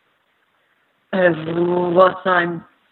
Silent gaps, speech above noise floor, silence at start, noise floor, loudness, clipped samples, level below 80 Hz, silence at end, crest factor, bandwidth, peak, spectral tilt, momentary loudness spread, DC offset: none; 47 dB; 1.1 s; -64 dBFS; -17 LUFS; under 0.1%; -62 dBFS; 0.3 s; 20 dB; 4.3 kHz; 0 dBFS; -9.5 dB/octave; 11 LU; under 0.1%